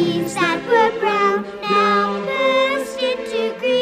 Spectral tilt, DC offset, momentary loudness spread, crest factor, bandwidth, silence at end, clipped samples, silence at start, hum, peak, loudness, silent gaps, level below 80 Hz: -4.5 dB/octave; under 0.1%; 6 LU; 14 dB; 15.5 kHz; 0 s; under 0.1%; 0 s; none; -4 dBFS; -18 LUFS; none; -56 dBFS